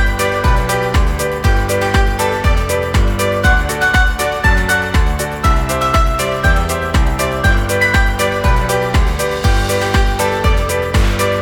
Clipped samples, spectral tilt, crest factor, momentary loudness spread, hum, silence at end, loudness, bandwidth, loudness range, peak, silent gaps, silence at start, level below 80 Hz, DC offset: under 0.1%; -4.5 dB/octave; 12 dB; 3 LU; none; 0 s; -15 LUFS; 18 kHz; 1 LU; 0 dBFS; none; 0 s; -16 dBFS; under 0.1%